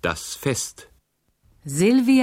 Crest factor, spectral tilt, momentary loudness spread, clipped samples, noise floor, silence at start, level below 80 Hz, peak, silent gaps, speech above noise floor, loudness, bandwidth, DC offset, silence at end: 14 dB; -4.5 dB/octave; 14 LU; under 0.1%; -66 dBFS; 0.05 s; -52 dBFS; -8 dBFS; none; 46 dB; -22 LUFS; 16.5 kHz; under 0.1%; 0 s